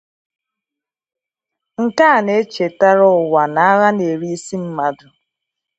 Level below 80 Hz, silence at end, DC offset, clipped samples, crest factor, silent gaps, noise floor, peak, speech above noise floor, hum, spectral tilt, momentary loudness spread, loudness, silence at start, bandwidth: -66 dBFS; 0.85 s; under 0.1%; under 0.1%; 16 dB; none; -86 dBFS; 0 dBFS; 71 dB; none; -5.5 dB/octave; 12 LU; -15 LUFS; 1.8 s; 8.2 kHz